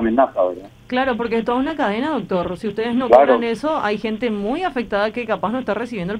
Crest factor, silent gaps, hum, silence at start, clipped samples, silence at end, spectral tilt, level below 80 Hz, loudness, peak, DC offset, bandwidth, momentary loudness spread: 18 dB; none; none; 0 s; under 0.1%; 0 s; -6.5 dB/octave; -48 dBFS; -19 LUFS; 0 dBFS; under 0.1%; 11 kHz; 10 LU